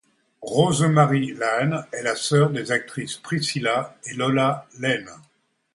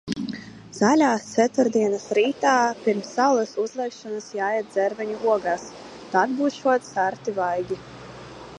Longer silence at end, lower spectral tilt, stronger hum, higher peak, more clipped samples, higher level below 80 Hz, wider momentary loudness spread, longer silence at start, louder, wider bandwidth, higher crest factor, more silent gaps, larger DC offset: first, 0.55 s vs 0 s; about the same, -5 dB/octave vs -4.5 dB/octave; neither; about the same, -2 dBFS vs -4 dBFS; neither; about the same, -62 dBFS vs -62 dBFS; second, 9 LU vs 14 LU; first, 0.4 s vs 0.05 s; about the same, -22 LUFS vs -23 LUFS; about the same, 11.5 kHz vs 11 kHz; about the same, 20 dB vs 18 dB; neither; neither